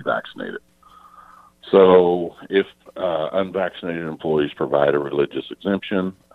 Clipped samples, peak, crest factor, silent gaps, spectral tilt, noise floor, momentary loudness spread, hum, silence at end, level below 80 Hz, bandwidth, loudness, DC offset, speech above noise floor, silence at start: under 0.1%; -2 dBFS; 20 dB; none; -8 dB/octave; -49 dBFS; 14 LU; none; 0.25 s; -58 dBFS; 4.5 kHz; -20 LUFS; under 0.1%; 29 dB; 0 s